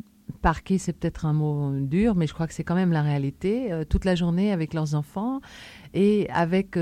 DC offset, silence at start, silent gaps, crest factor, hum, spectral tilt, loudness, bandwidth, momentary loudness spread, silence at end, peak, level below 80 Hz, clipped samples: under 0.1%; 0.3 s; none; 16 dB; none; -7.5 dB/octave; -25 LUFS; 11.5 kHz; 8 LU; 0 s; -8 dBFS; -38 dBFS; under 0.1%